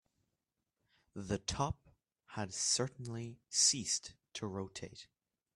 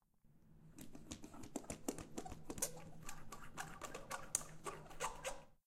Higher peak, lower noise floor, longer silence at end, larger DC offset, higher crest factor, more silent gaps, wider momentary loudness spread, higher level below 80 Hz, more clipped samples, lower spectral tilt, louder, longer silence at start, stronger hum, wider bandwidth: second, -18 dBFS vs -14 dBFS; first, -88 dBFS vs -69 dBFS; first, 0.5 s vs 0.15 s; neither; second, 22 dB vs 34 dB; neither; first, 20 LU vs 13 LU; about the same, -62 dBFS vs -62 dBFS; neither; about the same, -2.5 dB/octave vs -2.5 dB/octave; first, -36 LUFS vs -48 LUFS; first, 1.15 s vs 0.25 s; neither; second, 14 kHz vs 16 kHz